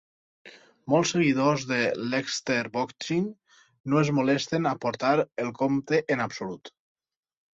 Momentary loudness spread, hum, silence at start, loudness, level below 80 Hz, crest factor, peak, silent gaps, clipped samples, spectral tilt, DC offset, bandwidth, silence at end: 9 LU; none; 0.45 s; -26 LUFS; -68 dBFS; 18 dB; -8 dBFS; 3.80-3.84 s; under 0.1%; -5 dB/octave; under 0.1%; 8 kHz; 0.85 s